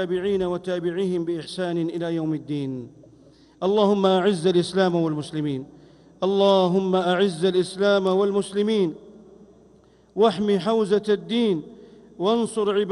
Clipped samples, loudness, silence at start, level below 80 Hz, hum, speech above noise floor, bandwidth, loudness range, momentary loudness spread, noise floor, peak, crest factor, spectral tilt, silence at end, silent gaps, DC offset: under 0.1%; -23 LUFS; 0 s; -62 dBFS; none; 33 dB; 11.5 kHz; 4 LU; 9 LU; -54 dBFS; -6 dBFS; 16 dB; -6.5 dB/octave; 0 s; none; under 0.1%